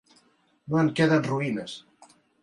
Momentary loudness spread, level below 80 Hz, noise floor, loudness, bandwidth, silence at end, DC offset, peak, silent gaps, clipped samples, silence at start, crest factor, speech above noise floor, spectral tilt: 16 LU; -66 dBFS; -64 dBFS; -25 LUFS; 11.5 kHz; 0.65 s; under 0.1%; -8 dBFS; none; under 0.1%; 0.65 s; 18 dB; 40 dB; -6.5 dB/octave